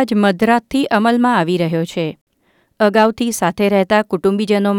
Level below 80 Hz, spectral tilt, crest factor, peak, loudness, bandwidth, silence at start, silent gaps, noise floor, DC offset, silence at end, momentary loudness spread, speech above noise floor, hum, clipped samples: -52 dBFS; -5.5 dB/octave; 14 dB; -2 dBFS; -15 LUFS; 17.5 kHz; 0 s; 2.21-2.27 s; -60 dBFS; under 0.1%; 0 s; 5 LU; 45 dB; none; under 0.1%